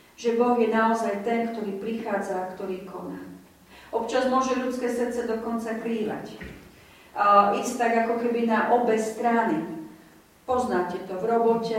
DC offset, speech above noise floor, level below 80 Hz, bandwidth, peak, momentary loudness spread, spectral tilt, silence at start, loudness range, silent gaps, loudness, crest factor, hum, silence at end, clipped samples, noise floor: under 0.1%; 29 dB; -60 dBFS; 16 kHz; -6 dBFS; 15 LU; -5 dB/octave; 0.2 s; 6 LU; none; -25 LUFS; 20 dB; none; 0 s; under 0.1%; -53 dBFS